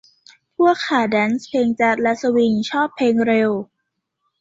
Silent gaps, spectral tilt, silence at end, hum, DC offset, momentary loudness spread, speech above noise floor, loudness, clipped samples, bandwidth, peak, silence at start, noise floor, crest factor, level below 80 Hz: none; -5.5 dB/octave; 0.75 s; none; under 0.1%; 5 LU; 58 dB; -18 LUFS; under 0.1%; 7.8 kHz; -4 dBFS; 0.6 s; -76 dBFS; 16 dB; -60 dBFS